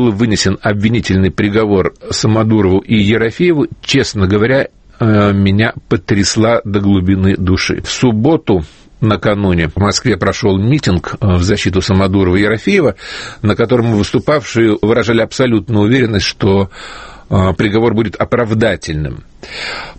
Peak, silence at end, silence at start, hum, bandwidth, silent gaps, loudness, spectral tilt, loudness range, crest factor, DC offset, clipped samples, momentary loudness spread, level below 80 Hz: 0 dBFS; 0.05 s; 0 s; none; 8.8 kHz; none; -13 LUFS; -6 dB/octave; 1 LU; 12 dB; under 0.1%; under 0.1%; 6 LU; -34 dBFS